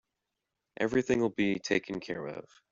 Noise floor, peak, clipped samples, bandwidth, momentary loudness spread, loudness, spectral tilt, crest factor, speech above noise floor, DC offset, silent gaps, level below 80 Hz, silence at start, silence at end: -86 dBFS; -14 dBFS; under 0.1%; 7.8 kHz; 11 LU; -31 LUFS; -5.5 dB/octave; 20 dB; 55 dB; under 0.1%; none; -64 dBFS; 0.8 s; 0.3 s